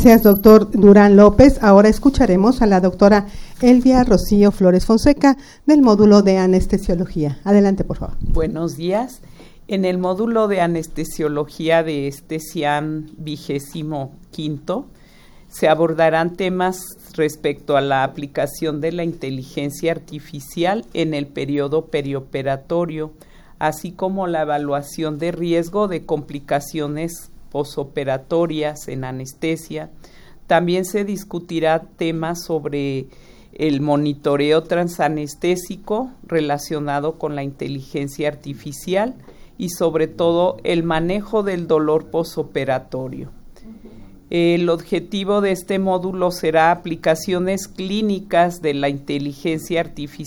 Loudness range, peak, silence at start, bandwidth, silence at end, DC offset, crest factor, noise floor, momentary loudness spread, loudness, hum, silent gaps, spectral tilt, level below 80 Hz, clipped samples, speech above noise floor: 10 LU; 0 dBFS; 0 s; 18 kHz; 0 s; under 0.1%; 18 dB; -45 dBFS; 15 LU; -18 LUFS; none; none; -6.5 dB/octave; -34 dBFS; under 0.1%; 28 dB